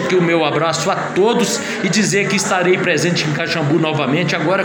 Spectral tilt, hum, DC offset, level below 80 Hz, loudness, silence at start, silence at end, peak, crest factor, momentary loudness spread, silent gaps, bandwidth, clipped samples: -4.5 dB/octave; none; under 0.1%; -58 dBFS; -16 LUFS; 0 s; 0 s; -2 dBFS; 14 dB; 3 LU; none; 17 kHz; under 0.1%